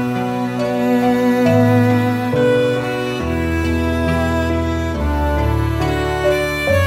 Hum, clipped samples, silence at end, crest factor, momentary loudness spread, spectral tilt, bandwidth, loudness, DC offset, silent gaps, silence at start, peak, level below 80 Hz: none; under 0.1%; 0 s; 12 dB; 6 LU; -7 dB/octave; 16 kHz; -17 LUFS; under 0.1%; none; 0 s; -4 dBFS; -28 dBFS